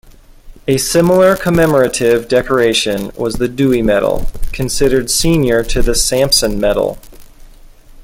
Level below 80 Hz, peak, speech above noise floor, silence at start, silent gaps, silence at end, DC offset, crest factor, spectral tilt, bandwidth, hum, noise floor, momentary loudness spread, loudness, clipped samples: -26 dBFS; 0 dBFS; 26 dB; 0.45 s; none; 0 s; under 0.1%; 14 dB; -4 dB/octave; 17 kHz; none; -38 dBFS; 9 LU; -13 LUFS; under 0.1%